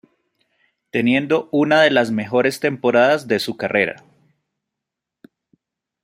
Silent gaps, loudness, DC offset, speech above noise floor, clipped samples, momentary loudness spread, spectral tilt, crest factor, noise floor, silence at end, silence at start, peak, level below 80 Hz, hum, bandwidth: none; -18 LUFS; under 0.1%; 66 dB; under 0.1%; 8 LU; -5.5 dB/octave; 18 dB; -84 dBFS; 2.1 s; 0.95 s; -2 dBFS; -64 dBFS; none; 16 kHz